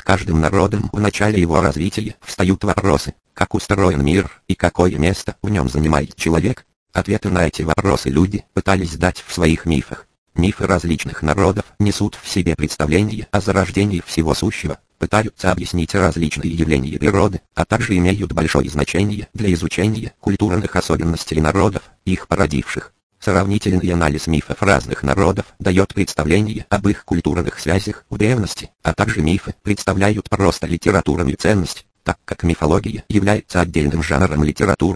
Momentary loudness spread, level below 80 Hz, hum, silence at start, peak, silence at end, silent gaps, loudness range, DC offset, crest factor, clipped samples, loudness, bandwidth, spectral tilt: 6 LU; -32 dBFS; none; 0.05 s; 0 dBFS; 0 s; 6.76-6.86 s, 10.18-10.26 s, 23.03-23.10 s; 1 LU; under 0.1%; 18 dB; under 0.1%; -18 LUFS; 11 kHz; -6 dB/octave